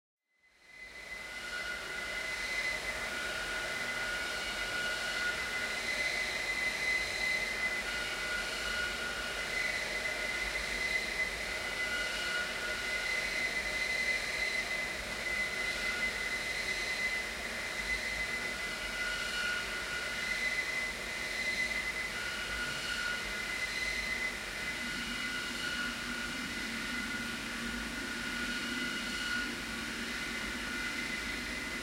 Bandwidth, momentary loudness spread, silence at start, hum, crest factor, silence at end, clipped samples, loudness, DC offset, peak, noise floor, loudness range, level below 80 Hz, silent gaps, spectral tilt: 16 kHz; 5 LU; 0.65 s; none; 16 dB; 0 s; under 0.1%; -34 LUFS; under 0.1%; -22 dBFS; -67 dBFS; 3 LU; -54 dBFS; none; -1.5 dB/octave